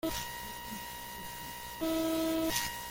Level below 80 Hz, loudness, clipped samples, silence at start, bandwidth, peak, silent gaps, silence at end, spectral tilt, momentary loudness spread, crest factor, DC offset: -54 dBFS; -35 LUFS; under 0.1%; 0.05 s; 17 kHz; -16 dBFS; none; 0 s; -3 dB/octave; 10 LU; 20 dB; under 0.1%